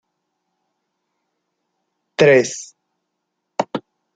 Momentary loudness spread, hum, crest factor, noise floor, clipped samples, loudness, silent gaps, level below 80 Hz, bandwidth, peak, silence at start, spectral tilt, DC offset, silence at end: 18 LU; none; 20 dB; -76 dBFS; under 0.1%; -17 LUFS; none; -62 dBFS; 9.4 kHz; -2 dBFS; 2.2 s; -4.5 dB/octave; under 0.1%; 0.35 s